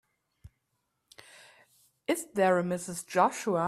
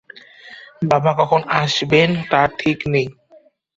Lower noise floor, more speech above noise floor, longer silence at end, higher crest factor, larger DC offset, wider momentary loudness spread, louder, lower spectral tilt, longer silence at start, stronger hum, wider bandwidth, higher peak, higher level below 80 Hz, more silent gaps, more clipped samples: first, -80 dBFS vs -51 dBFS; first, 52 dB vs 34 dB; second, 0 s vs 0.65 s; about the same, 22 dB vs 18 dB; neither; about the same, 11 LU vs 12 LU; second, -29 LUFS vs -17 LUFS; about the same, -5 dB/octave vs -5.5 dB/octave; first, 2.1 s vs 0.15 s; neither; first, 15.5 kHz vs 7.8 kHz; second, -10 dBFS vs 0 dBFS; second, -70 dBFS vs -52 dBFS; neither; neither